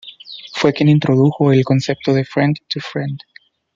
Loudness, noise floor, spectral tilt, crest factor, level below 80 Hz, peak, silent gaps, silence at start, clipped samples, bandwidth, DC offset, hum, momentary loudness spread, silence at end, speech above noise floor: -16 LUFS; -36 dBFS; -7 dB/octave; 14 dB; -56 dBFS; -2 dBFS; none; 0.05 s; under 0.1%; 7.4 kHz; under 0.1%; none; 15 LU; 0.6 s; 21 dB